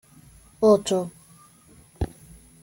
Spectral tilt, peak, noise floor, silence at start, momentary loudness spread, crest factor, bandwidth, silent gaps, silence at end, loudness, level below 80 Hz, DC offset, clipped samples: -6 dB/octave; -8 dBFS; -53 dBFS; 0.6 s; 15 LU; 20 dB; 17 kHz; none; 0.55 s; -23 LUFS; -46 dBFS; under 0.1%; under 0.1%